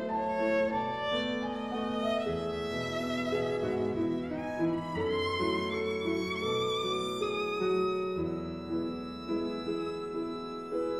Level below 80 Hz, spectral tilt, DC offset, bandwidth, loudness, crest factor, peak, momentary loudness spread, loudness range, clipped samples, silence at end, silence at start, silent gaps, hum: -62 dBFS; -5.5 dB/octave; under 0.1%; 14.5 kHz; -32 LUFS; 14 dB; -18 dBFS; 6 LU; 2 LU; under 0.1%; 0 s; 0 s; none; none